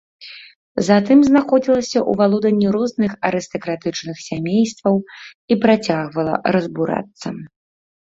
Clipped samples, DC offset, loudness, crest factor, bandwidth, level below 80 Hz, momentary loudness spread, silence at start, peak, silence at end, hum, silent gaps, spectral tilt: under 0.1%; under 0.1%; -18 LUFS; 16 dB; 7.8 kHz; -56 dBFS; 17 LU; 0.2 s; -2 dBFS; 0.6 s; none; 0.56-0.75 s, 5.35-5.48 s; -6 dB/octave